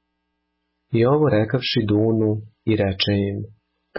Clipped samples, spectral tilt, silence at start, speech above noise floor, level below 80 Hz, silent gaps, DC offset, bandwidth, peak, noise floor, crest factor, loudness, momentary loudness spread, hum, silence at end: under 0.1%; -10.5 dB/octave; 0.9 s; 55 dB; -46 dBFS; none; under 0.1%; 5.8 kHz; -8 dBFS; -74 dBFS; 14 dB; -20 LUFS; 9 LU; none; 0 s